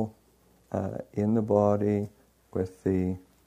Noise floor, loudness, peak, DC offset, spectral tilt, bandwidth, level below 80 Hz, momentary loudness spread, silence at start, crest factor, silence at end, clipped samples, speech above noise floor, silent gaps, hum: -62 dBFS; -29 LUFS; -10 dBFS; under 0.1%; -10 dB/octave; 11 kHz; -60 dBFS; 12 LU; 0 s; 18 dB; 0.25 s; under 0.1%; 36 dB; none; none